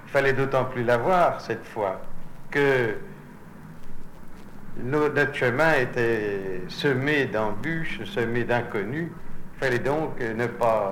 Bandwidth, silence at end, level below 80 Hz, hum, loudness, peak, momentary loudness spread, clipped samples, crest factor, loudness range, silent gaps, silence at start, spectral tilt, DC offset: 16 kHz; 0 s; -42 dBFS; none; -25 LUFS; -8 dBFS; 23 LU; under 0.1%; 16 dB; 4 LU; none; 0 s; -6.5 dB/octave; under 0.1%